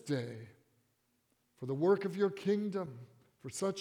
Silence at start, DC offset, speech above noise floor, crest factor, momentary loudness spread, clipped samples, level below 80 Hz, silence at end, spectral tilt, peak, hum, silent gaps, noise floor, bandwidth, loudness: 0.05 s; under 0.1%; 43 dB; 18 dB; 18 LU; under 0.1%; -82 dBFS; 0 s; -6 dB/octave; -18 dBFS; none; none; -77 dBFS; 14.5 kHz; -35 LUFS